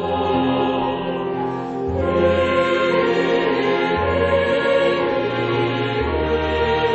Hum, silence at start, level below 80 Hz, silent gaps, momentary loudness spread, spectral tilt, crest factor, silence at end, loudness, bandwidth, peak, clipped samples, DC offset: none; 0 s; -38 dBFS; none; 6 LU; -7 dB/octave; 14 dB; 0 s; -19 LUFS; 8.2 kHz; -6 dBFS; under 0.1%; under 0.1%